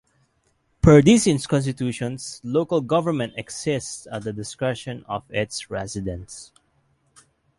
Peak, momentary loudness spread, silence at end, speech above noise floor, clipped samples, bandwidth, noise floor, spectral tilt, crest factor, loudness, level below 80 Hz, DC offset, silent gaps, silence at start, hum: -2 dBFS; 17 LU; 1.15 s; 45 dB; under 0.1%; 11.5 kHz; -67 dBFS; -5.5 dB/octave; 22 dB; -22 LUFS; -44 dBFS; under 0.1%; none; 0.85 s; none